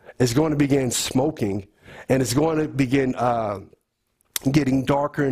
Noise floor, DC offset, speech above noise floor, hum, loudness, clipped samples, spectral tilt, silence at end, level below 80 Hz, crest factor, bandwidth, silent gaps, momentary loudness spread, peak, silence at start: -70 dBFS; under 0.1%; 49 dB; none; -22 LUFS; under 0.1%; -5.5 dB/octave; 0 s; -48 dBFS; 18 dB; 16 kHz; none; 9 LU; -6 dBFS; 0.1 s